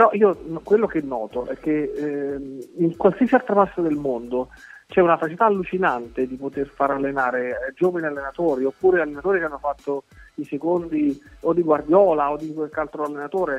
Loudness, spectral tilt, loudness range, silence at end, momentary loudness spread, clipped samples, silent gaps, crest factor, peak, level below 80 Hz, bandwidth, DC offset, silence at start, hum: -22 LUFS; -8 dB/octave; 3 LU; 0 s; 11 LU; under 0.1%; none; 20 dB; -2 dBFS; -52 dBFS; 8.8 kHz; under 0.1%; 0 s; none